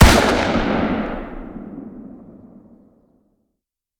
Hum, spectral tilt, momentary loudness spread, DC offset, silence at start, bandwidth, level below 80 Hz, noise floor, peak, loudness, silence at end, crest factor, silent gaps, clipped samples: none; -5 dB/octave; 23 LU; under 0.1%; 0 s; over 20 kHz; -26 dBFS; -79 dBFS; 0 dBFS; -18 LUFS; 1.85 s; 20 dB; none; 0.1%